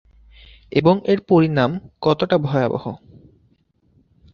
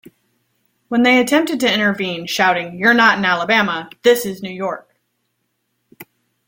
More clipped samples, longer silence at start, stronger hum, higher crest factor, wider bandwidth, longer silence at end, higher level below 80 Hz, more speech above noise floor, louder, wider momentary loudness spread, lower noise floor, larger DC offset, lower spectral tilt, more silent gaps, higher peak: neither; second, 0.7 s vs 0.9 s; neither; about the same, 18 dB vs 18 dB; second, 6.8 kHz vs 16.5 kHz; first, 1.35 s vs 0.45 s; first, -52 dBFS vs -62 dBFS; second, 43 dB vs 54 dB; second, -19 LUFS vs -16 LUFS; second, 9 LU vs 12 LU; second, -61 dBFS vs -70 dBFS; neither; first, -8.5 dB/octave vs -4 dB/octave; neither; about the same, -2 dBFS vs -2 dBFS